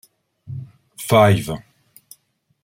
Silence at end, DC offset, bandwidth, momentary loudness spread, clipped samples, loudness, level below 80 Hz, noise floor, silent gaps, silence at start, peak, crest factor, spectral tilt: 1.05 s; under 0.1%; 16 kHz; 21 LU; under 0.1%; -16 LUFS; -52 dBFS; -63 dBFS; none; 0.5 s; -2 dBFS; 20 dB; -6 dB/octave